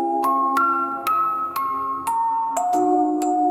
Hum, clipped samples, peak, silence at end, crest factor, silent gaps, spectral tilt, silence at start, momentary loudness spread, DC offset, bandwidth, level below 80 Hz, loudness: none; under 0.1%; -6 dBFS; 0 s; 14 dB; none; -4 dB/octave; 0 s; 5 LU; under 0.1%; 17 kHz; -70 dBFS; -21 LUFS